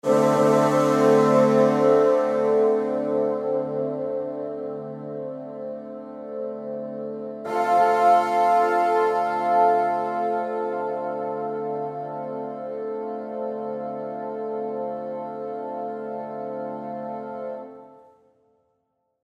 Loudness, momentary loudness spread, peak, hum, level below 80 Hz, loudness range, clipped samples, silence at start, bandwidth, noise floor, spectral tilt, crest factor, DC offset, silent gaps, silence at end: -23 LUFS; 15 LU; -6 dBFS; none; -74 dBFS; 12 LU; under 0.1%; 0.05 s; 14 kHz; -73 dBFS; -6.5 dB/octave; 18 dB; under 0.1%; none; 1.3 s